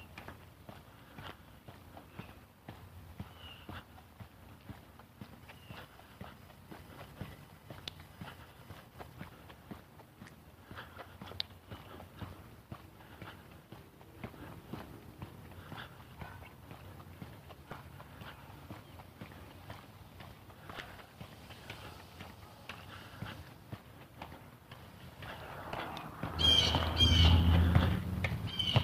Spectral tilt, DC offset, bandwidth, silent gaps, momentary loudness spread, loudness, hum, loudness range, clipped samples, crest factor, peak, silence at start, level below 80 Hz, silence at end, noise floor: -5 dB/octave; under 0.1%; 15.5 kHz; none; 24 LU; -32 LUFS; none; 22 LU; under 0.1%; 26 dB; -12 dBFS; 0 s; -46 dBFS; 0 s; -55 dBFS